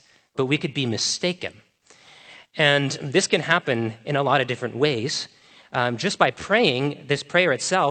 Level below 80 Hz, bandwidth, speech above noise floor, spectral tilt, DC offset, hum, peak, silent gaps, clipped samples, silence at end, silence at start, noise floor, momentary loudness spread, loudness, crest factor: -66 dBFS; 9 kHz; 31 dB; -4 dB/octave; under 0.1%; none; 0 dBFS; none; under 0.1%; 0 s; 0.35 s; -53 dBFS; 9 LU; -22 LUFS; 22 dB